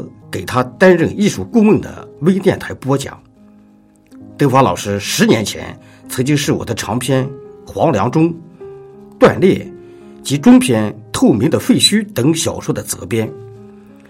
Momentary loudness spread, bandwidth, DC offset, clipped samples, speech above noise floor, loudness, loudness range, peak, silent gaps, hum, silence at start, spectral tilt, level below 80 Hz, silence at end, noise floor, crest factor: 17 LU; 16.5 kHz; under 0.1%; under 0.1%; 34 dB; -14 LUFS; 4 LU; 0 dBFS; none; none; 0 s; -5 dB/octave; -50 dBFS; 0.45 s; -47 dBFS; 16 dB